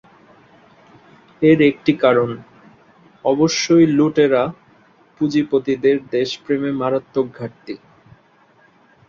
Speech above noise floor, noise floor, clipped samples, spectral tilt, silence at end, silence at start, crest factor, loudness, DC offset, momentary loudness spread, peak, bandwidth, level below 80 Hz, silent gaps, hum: 37 dB; -53 dBFS; under 0.1%; -5.5 dB/octave; 1.3 s; 1.4 s; 18 dB; -17 LUFS; under 0.1%; 14 LU; -2 dBFS; 7.4 kHz; -58 dBFS; none; none